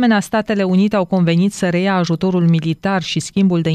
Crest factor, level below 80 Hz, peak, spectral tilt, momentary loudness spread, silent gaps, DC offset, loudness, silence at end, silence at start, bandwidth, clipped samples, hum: 10 dB; -50 dBFS; -4 dBFS; -6.5 dB/octave; 4 LU; none; under 0.1%; -16 LUFS; 0 s; 0 s; 13 kHz; under 0.1%; none